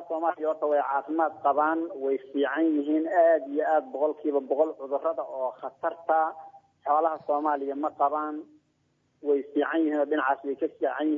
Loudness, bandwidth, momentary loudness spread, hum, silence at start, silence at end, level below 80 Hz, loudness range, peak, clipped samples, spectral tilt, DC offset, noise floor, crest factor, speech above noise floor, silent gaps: -27 LUFS; 3.7 kHz; 7 LU; none; 0 s; 0 s; -88 dBFS; 3 LU; -12 dBFS; under 0.1%; -6.5 dB/octave; under 0.1%; -71 dBFS; 16 dB; 44 dB; none